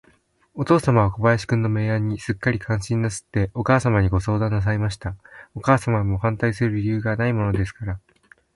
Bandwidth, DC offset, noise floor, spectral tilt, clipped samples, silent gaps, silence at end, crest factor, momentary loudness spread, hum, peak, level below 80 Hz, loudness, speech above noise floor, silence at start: 11.5 kHz; under 0.1%; -60 dBFS; -7 dB/octave; under 0.1%; none; 0.55 s; 20 dB; 12 LU; none; -2 dBFS; -40 dBFS; -22 LUFS; 39 dB; 0.55 s